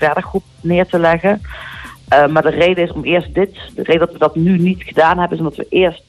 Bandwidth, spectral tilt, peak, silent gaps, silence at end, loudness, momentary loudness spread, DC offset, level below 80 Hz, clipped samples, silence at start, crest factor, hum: 12.5 kHz; -7.5 dB/octave; -2 dBFS; none; 0.1 s; -14 LUFS; 10 LU; under 0.1%; -38 dBFS; under 0.1%; 0 s; 12 dB; none